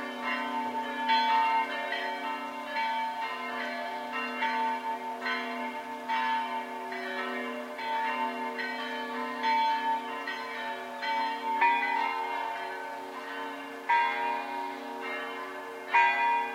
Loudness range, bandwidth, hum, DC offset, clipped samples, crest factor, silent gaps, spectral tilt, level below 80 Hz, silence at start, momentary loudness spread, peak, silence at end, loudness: 3 LU; 16.5 kHz; none; under 0.1%; under 0.1%; 20 dB; none; -2 dB/octave; -88 dBFS; 0 s; 11 LU; -10 dBFS; 0 s; -31 LUFS